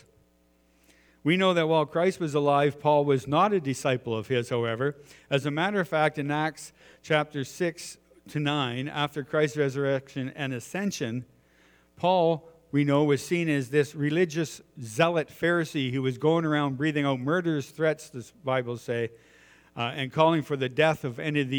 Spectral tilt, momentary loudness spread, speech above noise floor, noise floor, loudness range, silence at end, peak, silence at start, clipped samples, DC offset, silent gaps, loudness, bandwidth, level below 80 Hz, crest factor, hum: -6 dB/octave; 10 LU; 38 dB; -65 dBFS; 5 LU; 0 s; -6 dBFS; 1.25 s; under 0.1%; under 0.1%; none; -27 LUFS; over 20 kHz; -68 dBFS; 22 dB; none